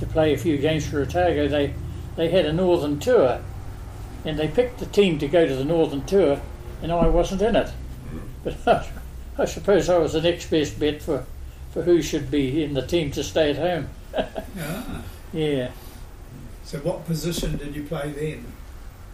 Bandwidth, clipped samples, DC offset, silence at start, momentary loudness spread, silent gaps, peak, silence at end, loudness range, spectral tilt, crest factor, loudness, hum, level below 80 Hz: 15.5 kHz; under 0.1%; under 0.1%; 0 s; 17 LU; none; -6 dBFS; 0 s; 8 LU; -6 dB/octave; 16 dB; -23 LUFS; none; -36 dBFS